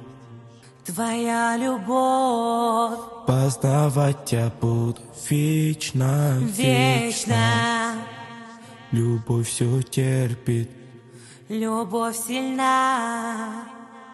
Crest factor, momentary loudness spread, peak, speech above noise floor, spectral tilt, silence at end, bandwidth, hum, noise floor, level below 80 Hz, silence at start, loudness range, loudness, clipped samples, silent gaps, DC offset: 18 dB; 13 LU; -6 dBFS; 24 dB; -5.5 dB/octave; 0 s; 12.5 kHz; none; -46 dBFS; -58 dBFS; 0 s; 4 LU; -23 LUFS; under 0.1%; none; under 0.1%